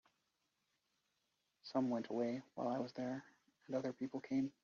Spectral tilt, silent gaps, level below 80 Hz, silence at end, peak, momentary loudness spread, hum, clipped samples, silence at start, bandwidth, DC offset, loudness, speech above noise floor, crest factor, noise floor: -6 dB/octave; none; -86 dBFS; 0.15 s; -24 dBFS; 6 LU; none; under 0.1%; 1.65 s; 7.2 kHz; under 0.1%; -43 LUFS; 44 dB; 20 dB; -85 dBFS